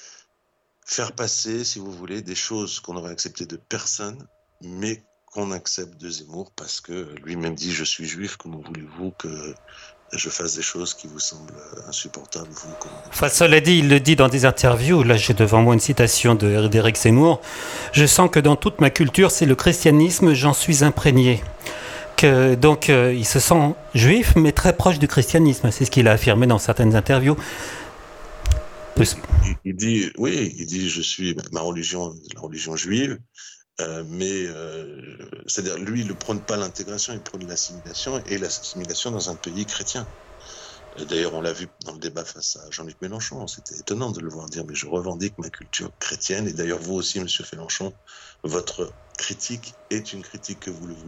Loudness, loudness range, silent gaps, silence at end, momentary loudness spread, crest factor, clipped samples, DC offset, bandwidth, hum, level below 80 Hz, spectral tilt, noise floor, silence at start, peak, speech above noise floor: -20 LUFS; 13 LU; none; 0 s; 20 LU; 20 dB; under 0.1%; under 0.1%; 17.5 kHz; none; -36 dBFS; -4.5 dB/octave; -69 dBFS; 0.05 s; 0 dBFS; 49 dB